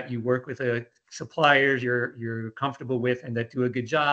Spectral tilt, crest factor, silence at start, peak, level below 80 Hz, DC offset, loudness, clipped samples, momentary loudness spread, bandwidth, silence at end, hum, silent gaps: -6 dB/octave; 20 dB; 0 s; -6 dBFS; -70 dBFS; under 0.1%; -26 LUFS; under 0.1%; 13 LU; 8.4 kHz; 0 s; none; none